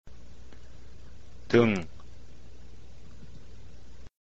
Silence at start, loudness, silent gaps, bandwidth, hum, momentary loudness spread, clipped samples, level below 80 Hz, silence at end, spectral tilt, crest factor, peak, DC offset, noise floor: 0.05 s; -25 LUFS; none; 8.2 kHz; none; 29 LU; under 0.1%; -52 dBFS; 0 s; -7 dB/octave; 24 dB; -8 dBFS; 1%; -51 dBFS